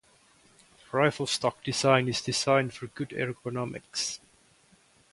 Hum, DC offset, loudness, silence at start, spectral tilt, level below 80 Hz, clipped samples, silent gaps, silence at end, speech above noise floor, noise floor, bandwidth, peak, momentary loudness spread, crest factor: none; under 0.1%; -28 LUFS; 0.9 s; -4 dB/octave; -66 dBFS; under 0.1%; none; 0.95 s; 34 dB; -62 dBFS; 11.5 kHz; -8 dBFS; 12 LU; 22 dB